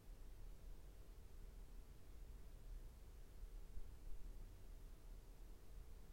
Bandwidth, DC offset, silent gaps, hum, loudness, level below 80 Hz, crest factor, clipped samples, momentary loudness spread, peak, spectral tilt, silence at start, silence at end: 16 kHz; under 0.1%; none; none; -63 LUFS; -56 dBFS; 16 dB; under 0.1%; 3 LU; -38 dBFS; -5.5 dB/octave; 0 s; 0 s